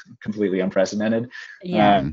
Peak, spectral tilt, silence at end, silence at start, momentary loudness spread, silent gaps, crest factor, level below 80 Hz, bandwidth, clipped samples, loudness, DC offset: -2 dBFS; -5 dB/octave; 0 s; 0.1 s; 16 LU; none; 18 dB; -52 dBFS; 7.8 kHz; under 0.1%; -21 LUFS; under 0.1%